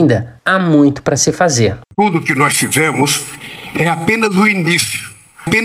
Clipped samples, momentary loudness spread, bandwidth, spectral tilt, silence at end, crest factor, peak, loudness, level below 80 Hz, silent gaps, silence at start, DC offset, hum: under 0.1%; 11 LU; 16 kHz; -4 dB/octave; 0 s; 14 dB; 0 dBFS; -13 LUFS; -48 dBFS; none; 0 s; under 0.1%; none